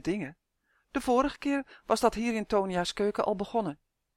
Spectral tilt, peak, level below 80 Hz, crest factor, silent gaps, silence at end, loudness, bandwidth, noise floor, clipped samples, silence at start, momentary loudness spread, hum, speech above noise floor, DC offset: -5 dB/octave; -10 dBFS; -54 dBFS; 20 dB; none; 0.4 s; -30 LUFS; 16 kHz; -74 dBFS; under 0.1%; 0.05 s; 10 LU; none; 45 dB; under 0.1%